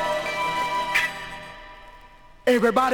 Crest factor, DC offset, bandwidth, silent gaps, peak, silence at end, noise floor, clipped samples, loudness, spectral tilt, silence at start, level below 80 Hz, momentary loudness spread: 18 dB; under 0.1%; 20 kHz; none; -6 dBFS; 0 s; -48 dBFS; under 0.1%; -23 LUFS; -3.5 dB/octave; 0 s; -52 dBFS; 21 LU